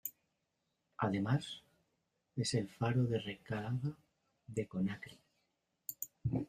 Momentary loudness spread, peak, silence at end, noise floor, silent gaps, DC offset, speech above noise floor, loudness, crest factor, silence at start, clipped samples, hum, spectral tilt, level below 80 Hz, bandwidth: 14 LU; -20 dBFS; 0.05 s; -84 dBFS; none; under 0.1%; 47 dB; -39 LUFS; 20 dB; 0.05 s; under 0.1%; none; -6 dB/octave; -68 dBFS; 15.5 kHz